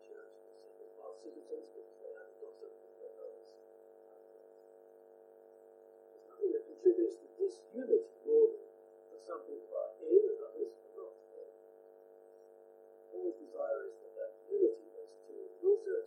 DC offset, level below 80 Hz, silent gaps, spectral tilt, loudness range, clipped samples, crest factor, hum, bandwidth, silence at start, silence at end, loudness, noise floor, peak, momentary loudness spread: under 0.1%; under -90 dBFS; none; -6 dB/octave; 20 LU; under 0.1%; 24 dB; none; 9.6 kHz; 0.1 s; 0 s; -36 LUFS; -59 dBFS; -14 dBFS; 25 LU